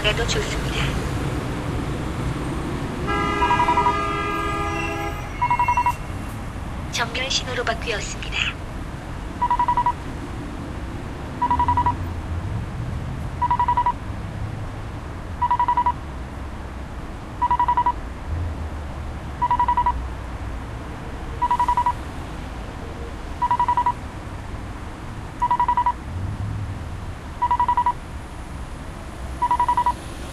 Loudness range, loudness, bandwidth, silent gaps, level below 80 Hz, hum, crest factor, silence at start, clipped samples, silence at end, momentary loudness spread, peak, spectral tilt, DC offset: 4 LU; -24 LUFS; 14 kHz; none; -34 dBFS; none; 18 dB; 0 s; under 0.1%; 0 s; 14 LU; -4 dBFS; -5 dB/octave; under 0.1%